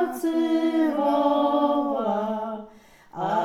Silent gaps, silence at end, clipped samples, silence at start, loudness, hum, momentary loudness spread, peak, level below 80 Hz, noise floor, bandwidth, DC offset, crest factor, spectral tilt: none; 0 s; under 0.1%; 0 s; -24 LUFS; none; 11 LU; -8 dBFS; -66 dBFS; -50 dBFS; 15 kHz; under 0.1%; 14 dB; -6 dB/octave